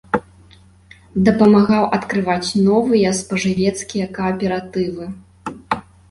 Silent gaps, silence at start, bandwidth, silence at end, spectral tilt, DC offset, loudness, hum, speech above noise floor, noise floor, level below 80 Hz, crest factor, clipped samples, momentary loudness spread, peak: none; 0.15 s; 11.5 kHz; 0.3 s; -6 dB/octave; under 0.1%; -17 LUFS; none; 31 dB; -47 dBFS; -48 dBFS; 16 dB; under 0.1%; 13 LU; -2 dBFS